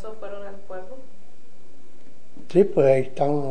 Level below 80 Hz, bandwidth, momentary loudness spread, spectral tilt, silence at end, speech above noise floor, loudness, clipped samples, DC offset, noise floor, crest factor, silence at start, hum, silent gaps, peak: -60 dBFS; 9.8 kHz; 21 LU; -8.5 dB/octave; 0 s; 34 dB; -20 LUFS; under 0.1%; 6%; -55 dBFS; 20 dB; 0.05 s; none; none; -6 dBFS